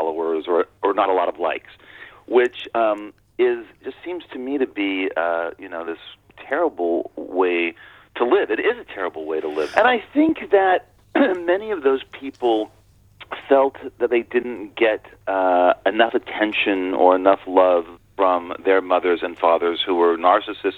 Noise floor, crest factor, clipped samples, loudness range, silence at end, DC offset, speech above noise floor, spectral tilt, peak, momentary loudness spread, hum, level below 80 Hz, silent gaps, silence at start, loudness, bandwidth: -47 dBFS; 20 dB; under 0.1%; 6 LU; 0 s; under 0.1%; 27 dB; -5.5 dB/octave; 0 dBFS; 13 LU; none; -60 dBFS; none; 0 s; -20 LUFS; 7.2 kHz